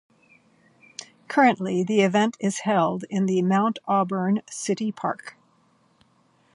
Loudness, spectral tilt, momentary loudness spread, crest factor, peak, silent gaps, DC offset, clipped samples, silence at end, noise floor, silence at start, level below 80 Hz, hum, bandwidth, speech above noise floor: -23 LUFS; -5.5 dB/octave; 18 LU; 18 dB; -6 dBFS; none; under 0.1%; under 0.1%; 1.25 s; -63 dBFS; 1.3 s; -72 dBFS; none; 11.5 kHz; 40 dB